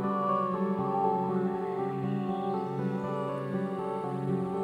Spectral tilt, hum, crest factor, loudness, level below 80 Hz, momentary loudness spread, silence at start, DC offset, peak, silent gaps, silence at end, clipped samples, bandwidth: -9 dB/octave; none; 14 dB; -31 LUFS; -68 dBFS; 5 LU; 0 s; under 0.1%; -16 dBFS; none; 0 s; under 0.1%; 9.6 kHz